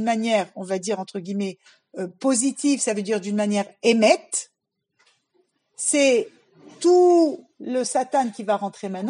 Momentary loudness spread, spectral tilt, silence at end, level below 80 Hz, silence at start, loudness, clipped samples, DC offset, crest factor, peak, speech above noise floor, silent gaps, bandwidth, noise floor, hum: 13 LU; -3.5 dB/octave; 0 s; -86 dBFS; 0 s; -22 LUFS; under 0.1%; under 0.1%; 20 dB; -4 dBFS; 48 dB; none; 11.5 kHz; -70 dBFS; none